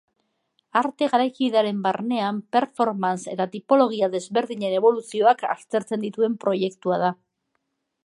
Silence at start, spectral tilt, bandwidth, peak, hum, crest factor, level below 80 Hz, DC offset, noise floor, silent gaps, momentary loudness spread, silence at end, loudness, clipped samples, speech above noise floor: 0.75 s; -5.5 dB/octave; 11.5 kHz; -4 dBFS; none; 18 dB; -76 dBFS; under 0.1%; -76 dBFS; none; 7 LU; 0.9 s; -23 LUFS; under 0.1%; 53 dB